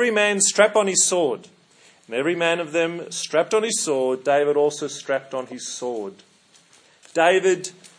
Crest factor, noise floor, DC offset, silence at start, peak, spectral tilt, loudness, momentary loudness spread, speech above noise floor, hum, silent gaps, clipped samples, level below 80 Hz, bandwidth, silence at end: 22 dB; -55 dBFS; under 0.1%; 0 s; 0 dBFS; -2 dB/octave; -21 LUFS; 13 LU; 34 dB; none; none; under 0.1%; -82 dBFS; 10.5 kHz; 0.1 s